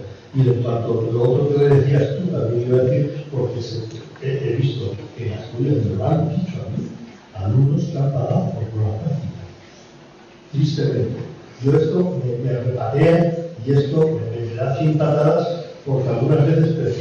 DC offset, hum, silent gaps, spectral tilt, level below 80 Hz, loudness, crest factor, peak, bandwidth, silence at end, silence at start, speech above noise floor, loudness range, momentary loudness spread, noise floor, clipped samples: under 0.1%; none; none; -9 dB/octave; -52 dBFS; -20 LUFS; 12 dB; -6 dBFS; 7 kHz; 0 s; 0 s; 26 dB; 5 LU; 13 LU; -44 dBFS; under 0.1%